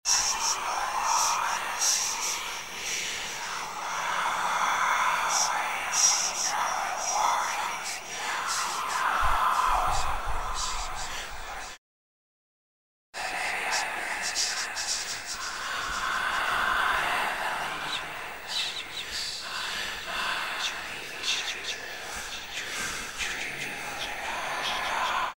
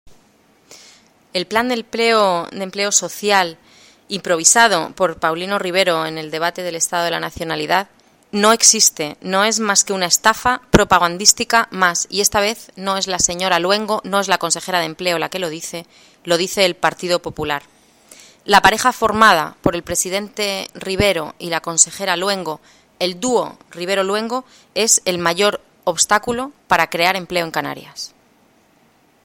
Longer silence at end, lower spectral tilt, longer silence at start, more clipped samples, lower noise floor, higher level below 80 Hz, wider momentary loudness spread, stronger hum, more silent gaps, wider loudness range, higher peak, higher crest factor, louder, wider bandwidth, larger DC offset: second, 0.05 s vs 1.2 s; second, 0.5 dB/octave vs -2 dB/octave; about the same, 0.05 s vs 0.05 s; neither; first, under -90 dBFS vs -55 dBFS; about the same, -44 dBFS vs -46 dBFS; second, 9 LU vs 13 LU; neither; first, 11.78-13.13 s vs none; about the same, 7 LU vs 5 LU; second, -10 dBFS vs 0 dBFS; about the same, 20 dB vs 18 dB; second, -28 LUFS vs -16 LUFS; about the same, 16 kHz vs 17 kHz; first, 0.3% vs under 0.1%